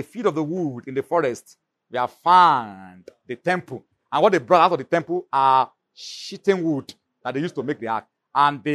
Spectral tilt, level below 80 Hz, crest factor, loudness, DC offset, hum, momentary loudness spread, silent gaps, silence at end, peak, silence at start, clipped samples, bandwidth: -5.5 dB/octave; -72 dBFS; 20 dB; -21 LUFS; under 0.1%; none; 17 LU; none; 0 s; -2 dBFS; 0 s; under 0.1%; 13 kHz